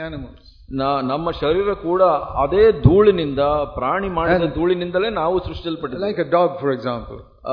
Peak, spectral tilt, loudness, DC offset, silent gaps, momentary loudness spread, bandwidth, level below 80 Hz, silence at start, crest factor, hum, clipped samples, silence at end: 0 dBFS; -9.5 dB/octave; -19 LUFS; under 0.1%; none; 13 LU; 5.2 kHz; -36 dBFS; 0 s; 18 dB; none; under 0.1%; 0 s